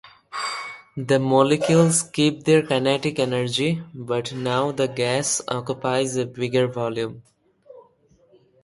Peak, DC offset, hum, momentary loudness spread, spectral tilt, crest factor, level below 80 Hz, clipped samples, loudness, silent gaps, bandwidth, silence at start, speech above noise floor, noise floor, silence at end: -4 dBFS; under 0.1%; none; 12 LU; -4.5 dB/octave; 20 dB; -62 dBFS; under 0.1%; -22 LUFS; none; 11.5 kHz; 0.05 s; 37 dB; -58 dBFS; 0.85 s